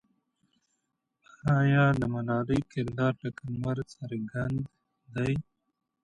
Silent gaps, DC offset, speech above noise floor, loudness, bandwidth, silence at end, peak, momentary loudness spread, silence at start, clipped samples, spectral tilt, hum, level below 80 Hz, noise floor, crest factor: none; under 0.1%; 52 dB; -30 LUFS; 9.4 kHz; 0.6 s; -12 dBFS; 13 LU; 1.45 s; under 0.1%; -8.5 dB/octave; none; -56 dBFS; -80 dBFS; 18 dB